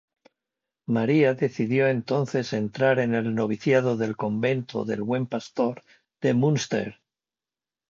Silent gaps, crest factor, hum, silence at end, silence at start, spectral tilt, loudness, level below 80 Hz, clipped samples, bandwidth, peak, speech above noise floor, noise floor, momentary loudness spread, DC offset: none; 18 dB; none; 1 s; 0.9 s; -6.5 dB/octave; -25 LUFS; -66 dBFS; under 0.1%; 7.6 kHz; -8 dBFS; over 66 dB; under -90 dBFS; 7 LU; under 0.1%